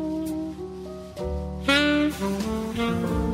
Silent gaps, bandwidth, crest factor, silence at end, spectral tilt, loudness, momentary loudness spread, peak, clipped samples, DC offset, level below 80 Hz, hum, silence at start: none; 16 kHz; 20 dB; 0 s; -5 dB/octave; -25 LUFS; 16 LU; -6 dBFS; under 0.1%; under 0.1%; -38 dBFS; none; 0 s